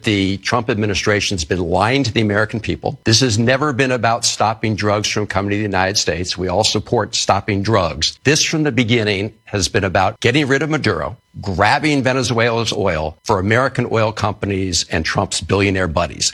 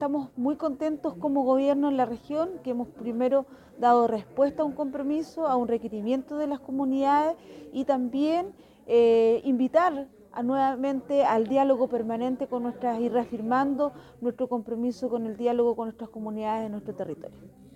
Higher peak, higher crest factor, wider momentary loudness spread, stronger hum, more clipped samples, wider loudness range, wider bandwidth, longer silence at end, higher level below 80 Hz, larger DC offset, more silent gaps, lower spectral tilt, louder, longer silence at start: first, 0 dBFS vs -10 dBFS; about the same, 16 dB vs 18 dB; second, 5 LU vs 11 LU; neither; neither; second, 1 LU vs 4 LU; first, 13.5 kHz vs 10.5 kHz; second, 0 s vs 0.25 s; first, -40 dBFS vs -64 dBFS; neither; neither; second, -4 dB/octave vs -7 dB/octave; first, -17 LUFS vs -27 LUFS; about the same, 0.05 s vs 0 s